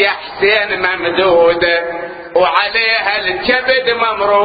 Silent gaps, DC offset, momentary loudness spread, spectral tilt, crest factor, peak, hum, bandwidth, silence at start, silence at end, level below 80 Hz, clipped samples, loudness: none; under 0.1%; 5 LU; -6.5 dB/octave; 14 dB; 0 dBFS; none; 5 kHz; 0 s; 0 s; -46 dBFS; under 0.1%; -13 LUFS